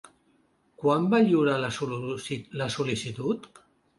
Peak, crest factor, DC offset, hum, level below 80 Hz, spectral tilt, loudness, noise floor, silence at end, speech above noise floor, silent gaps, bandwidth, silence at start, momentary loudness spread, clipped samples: -10 dBFS; 18 dB; under 0.1%; none; -64 dBFS; -6 dB/octave; -27 LUFS; -66 dBFS; 0.5 s; 40 dB; none; 11.5 kHz; 0.8 s; 11 LU; under 0.1%